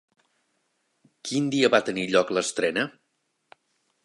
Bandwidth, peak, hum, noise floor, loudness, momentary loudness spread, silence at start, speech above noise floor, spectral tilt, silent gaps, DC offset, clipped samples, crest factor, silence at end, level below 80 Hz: 11.5 kHz; -4 dBFS; none; -75 dBFS; -24 LUFS; 9 LU; 1.25 s; 51 dB; -4 dB/octave; none; under 0.1%; under 0.1%; 24 dB; 1.15 s; -70 dBFS